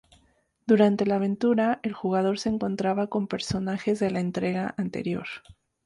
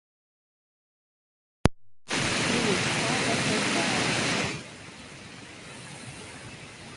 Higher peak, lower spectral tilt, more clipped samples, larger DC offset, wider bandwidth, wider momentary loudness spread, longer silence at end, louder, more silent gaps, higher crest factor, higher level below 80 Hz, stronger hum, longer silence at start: second, -8 dBFS vs 0 dBFS; first, -6.5 dB/octave vs -3.5 dB/octave; neither; neither; about the same, 11.5 kHz vs 11.5 kHz; second, 9 LU vs 18 LU; first, 0.35 s vs 0 s; about the same, -26 LUFS vs -26 LUFS; neither; second, 18 dB vs 30 dB; second, -58 dBFS vs -48 dBFS; neither; second, 0.65 s vs 1.65 s